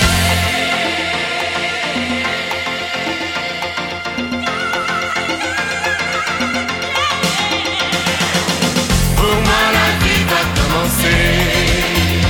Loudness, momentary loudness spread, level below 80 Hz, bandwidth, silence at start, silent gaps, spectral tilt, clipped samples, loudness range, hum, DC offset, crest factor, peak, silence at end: -15 LUFS; 7 LU; -26 dBFS; 17.5 kHz; 0 s; none; -3.5 dB/octave; under 0.1%; 5 LU; none; under 0.1%; 14 dB; -2 dBFS; 0 s